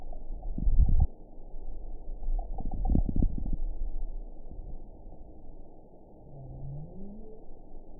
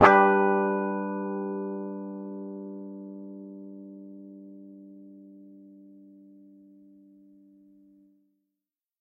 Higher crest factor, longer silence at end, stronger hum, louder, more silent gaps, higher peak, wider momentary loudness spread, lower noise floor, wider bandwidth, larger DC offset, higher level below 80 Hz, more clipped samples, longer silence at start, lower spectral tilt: second, 20 dB vs 30 dB; second, 0 s vs 3.55 s; neither; second, -35 LUFS vs -27 LUFS; neither; second, -10 dBFS vs 0 dBFS; second, 23 LU vs 27 LU; second, -50 dBFS vs -89 dBFS; second, 1 kHz vs 7.2 kHz; neither; first, -32 dBFS vs -70 dBFS; neither; about the same, 0 s vs 0 s; first, -17 dB/octave vs -7.5 dB/octave